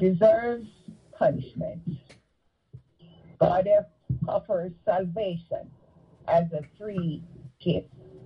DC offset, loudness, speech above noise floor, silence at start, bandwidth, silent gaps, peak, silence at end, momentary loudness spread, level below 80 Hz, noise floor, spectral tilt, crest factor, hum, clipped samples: under 0.1%; -27 LUFS; 45 dB; 0 s; 5.8 kHz; none; -8 dBFS; 0 s; 16 LU; -56 dBFS; -71 dBFS; -9.5 dB/octave; 20 dB; none; under 0.1%